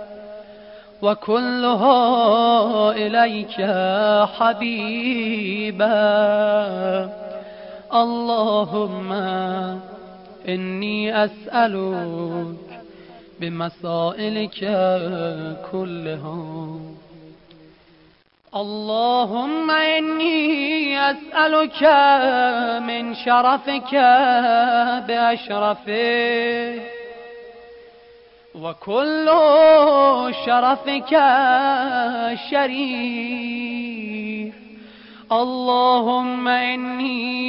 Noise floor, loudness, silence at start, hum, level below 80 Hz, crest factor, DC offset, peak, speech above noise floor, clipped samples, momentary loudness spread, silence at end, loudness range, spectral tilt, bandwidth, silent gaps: -55 dBFS; -19 LUFS; 0 s; none; -64 dBFS; 16 dB; under 0.1%; -4 dBFS; 37 dB; under 0.1%; 16 LU; 0 s; 9 LU; -10 dB/octave; 5.6 kHz; none